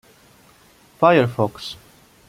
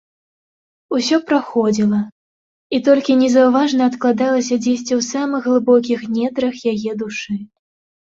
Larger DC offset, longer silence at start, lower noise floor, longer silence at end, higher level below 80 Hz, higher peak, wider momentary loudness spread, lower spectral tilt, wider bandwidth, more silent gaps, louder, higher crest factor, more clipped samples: neither; about the same, 1 s vs 0.9 s; second, -52 dBFS vs under -90 dBFS; about the same, 0.55 s vs 0.55 s; about the same, -58 dBFS vs -62 dBFS; about the same, -2 dBFS vs -2 dBFS; first, 18 LU vs 10 LU; first, -6.5 dB/octave vs -5 dB/octave; first, 16 kHz vs 7.8 kHz; second, none vs 2.12-2.70 s; about the same, -18 LUFS vs -17 LUFS; about the same, 20 dB vs 16 dB; neither